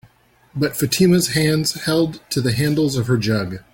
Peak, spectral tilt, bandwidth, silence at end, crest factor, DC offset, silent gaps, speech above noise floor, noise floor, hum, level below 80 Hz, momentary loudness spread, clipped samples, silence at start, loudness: -4 dBFS; -5 dB/octave; 17 kHz; 0.15 s; 16 dB; under 0.1%; none; 36 dB; -54 dBFS; none; -48 dBFS; 8 LU; under 0.1%; 0.55 s; -18 LUFS